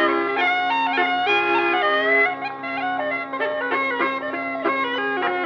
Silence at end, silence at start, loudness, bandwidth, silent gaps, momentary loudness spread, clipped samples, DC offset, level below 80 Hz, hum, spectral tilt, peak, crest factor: 0 s; 0 s; -21 LUFS; 7 kHz; none; 7 LU; under 0.1%; under 0.1%; -72 dBFS; 50 Hz at -65 dBFS; -4.5 dB/octave; -8 dBFS; 14 dB